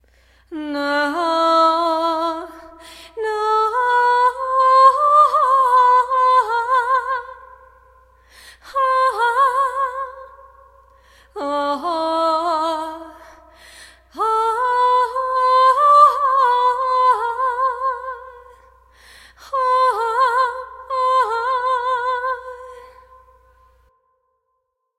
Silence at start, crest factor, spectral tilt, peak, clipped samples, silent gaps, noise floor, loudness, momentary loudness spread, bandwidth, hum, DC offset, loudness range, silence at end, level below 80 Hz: 0.5 s; 18 dB; -2.5 dB/octave; -2 dBFS; under 0.1%; none; -73 dBFS; -17 LUFS; 16 LU; 13.5 kHz; none; under 0.1%; 9 LU; 2.15 s; -56 dBFS